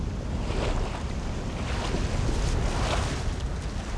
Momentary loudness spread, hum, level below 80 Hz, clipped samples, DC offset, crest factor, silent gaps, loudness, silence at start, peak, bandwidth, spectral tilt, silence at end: 5 LU; none; -30 dBFS; under 0.1%; under 0.1%; 14 dB; none; -30 LUFS; 0 s; -14 dBFS; 11 kHz; -5.5 dB/octave; 0 s